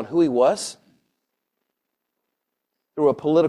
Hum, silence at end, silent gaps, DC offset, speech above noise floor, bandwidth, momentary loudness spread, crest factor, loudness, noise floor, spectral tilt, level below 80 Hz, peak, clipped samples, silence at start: none; 0 s; none; under 0.1%; 61 dB; 13 kHz; 14 LU; 18 dB; -20 LUFS; -80 dBFS; -5.5 dB/octave; -68 dBFS; -6 dBFS; under 0.1%; 0 s